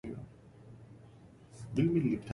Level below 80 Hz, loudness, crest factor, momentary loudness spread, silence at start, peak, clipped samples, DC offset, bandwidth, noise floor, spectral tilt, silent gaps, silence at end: -62 dBFS; -32 LUFS; 18 dB; 26 LU; 0.05 s; -18 dBFS; under 0.1%; under 0.1%; 11.5 kHz; -56 dBFS; -8.5 dB/octave; none; 0 s